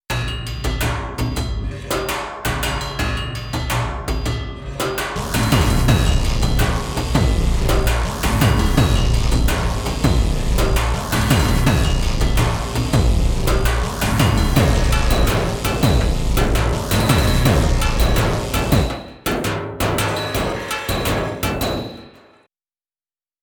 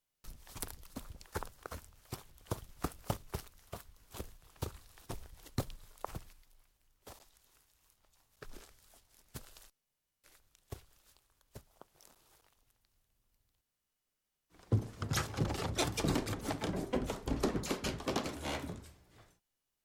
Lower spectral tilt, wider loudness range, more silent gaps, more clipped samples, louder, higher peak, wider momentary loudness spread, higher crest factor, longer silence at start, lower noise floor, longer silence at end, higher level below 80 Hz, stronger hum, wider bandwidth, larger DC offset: about the same, -5 dB/octave vs -5 dB/octave; second, 5 LU vs 22 LU; neither; neither; first, -19 LUFS vs -40 LUFS; first, 0 dBFS vs -16 dBFS; second, 8 LU vs 22 LU; second, 18 dB vs 26 dB; second, 0.1 s vs 0.25 s; about the same, under -90 dBFS vs -87 dBFS; first, 1.35 s vs 0.6 s; first, -22 dBFS vs -52 dBFS; neither; first, over 20 kHz vs 17.5 kHz; neither